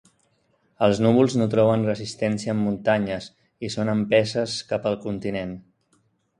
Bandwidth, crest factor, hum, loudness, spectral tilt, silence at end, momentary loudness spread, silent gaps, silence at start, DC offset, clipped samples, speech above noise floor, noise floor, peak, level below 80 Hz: 10.5 kHz; 20 dB; none; -23 LUFS; -6 dB/octave; 0.8 s; 13 LU; none; 0.8 s; under 0.1%; under 0.1%; 44 dB; -66 dBFS; -4 dBFS; -56 dBFS